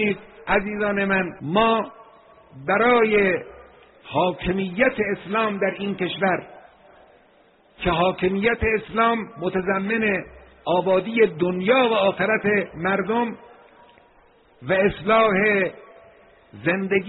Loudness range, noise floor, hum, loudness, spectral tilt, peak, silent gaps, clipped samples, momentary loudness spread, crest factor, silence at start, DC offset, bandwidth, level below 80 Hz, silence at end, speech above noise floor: 4 LU; -56 dBFS; none; -21 LUFS; -4 dB/octave; -6 dBFS; none; under 0.1%; 10 LU; 18 dB; 0 s; under 0.1%; 4.1 kHz; -48 dBFS; 0 s; 35 dB